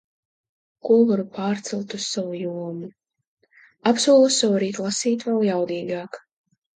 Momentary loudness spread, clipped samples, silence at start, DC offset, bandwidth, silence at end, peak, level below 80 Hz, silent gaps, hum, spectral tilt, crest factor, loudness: 17 LU; under 0.1%; 0.85 s; under 0.1%; 9.6 kHz; 0.6 s; -4 dBFS; -72 dBFS; 3.27-3.37 s; none; -4 dB/octave; 18 dB; -22 LUFS